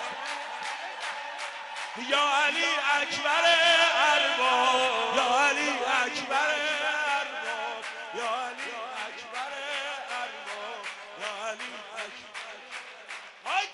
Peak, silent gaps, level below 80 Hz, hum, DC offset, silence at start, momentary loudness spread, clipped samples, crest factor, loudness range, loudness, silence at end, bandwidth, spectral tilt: -12 dBFS; none; -74 dBFS; none; under 0.1%; 0 s; 16 LU; under 0.1%; 18 dB; 13 LU; -27 LUFS; 0 s; 11.5 kHz; 0 dB/octave